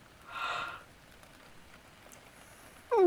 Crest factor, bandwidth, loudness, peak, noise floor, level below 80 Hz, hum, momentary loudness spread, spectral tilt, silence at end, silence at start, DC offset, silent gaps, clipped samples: 20 dB; over 20 kHz; -37 LUFS; -16 dBFS; -56 dBFS; -66 dBFS; none; 20 LU; -4.5 dB/octave; 0 s; 0.25 s; under 0.1%; none; under 0.1%